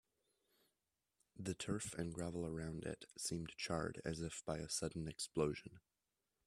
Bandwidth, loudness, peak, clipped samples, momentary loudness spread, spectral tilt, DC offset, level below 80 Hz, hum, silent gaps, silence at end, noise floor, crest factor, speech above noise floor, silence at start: 14 kHz; -45 LUFS; -24 dBFS; under 0.1%; 7 LU; -4.5 dB/octave; under 0.1%; -66 dBFS; none; none; 0.7 s; under -90 dBFS; 22 dB; over 45 dB; 1.35 s